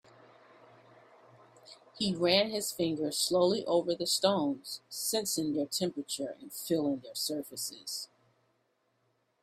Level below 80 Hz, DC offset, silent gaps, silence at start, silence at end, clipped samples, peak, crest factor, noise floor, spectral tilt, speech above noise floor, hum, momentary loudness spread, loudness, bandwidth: -74 dBFS; under 0.1%; none; 1.65 s; 1.35 s; under 0.1%; -10 dBFS; 22 dB; -76 dBFS; -3.5 dB/octave; 44 dB; none; 12 LU; -32 LUFS; 16 kHz